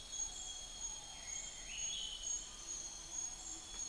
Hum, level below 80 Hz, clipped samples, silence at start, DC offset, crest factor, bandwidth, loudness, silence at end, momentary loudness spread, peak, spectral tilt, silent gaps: none; -60 dBFS; under 0.1%; 0 s; under 0.1%; 14 dB; 10.5 kHz; -43 LUFS; 0 s; 5 LU; -32 dBFS; 1 dB/octave; none